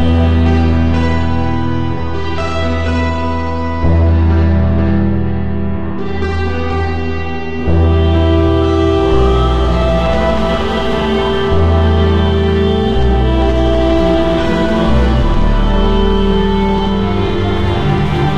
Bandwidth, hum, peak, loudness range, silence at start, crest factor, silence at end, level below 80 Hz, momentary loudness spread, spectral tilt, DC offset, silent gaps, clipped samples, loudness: 7.6 kHz; none; 0 dBFS; 3 LU; 0 s; 12 dB; 0 s; -18 dBFS; 6 LU; -8 dB/octave; 6%; none; under 0.1%; -14 LUFS